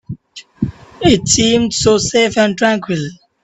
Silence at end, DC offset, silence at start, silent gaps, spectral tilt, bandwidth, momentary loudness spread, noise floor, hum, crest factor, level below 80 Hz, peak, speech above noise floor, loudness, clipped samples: 0.3 s; under 0.1%; 0.1 s; none; -3.5 dB/octave; 8.4 kHz; 13 LU; -35 dBFS; none; 14 dB; -40 dBFS; 0 dBFS; 22 dB; -14 LUFS; under 0.1%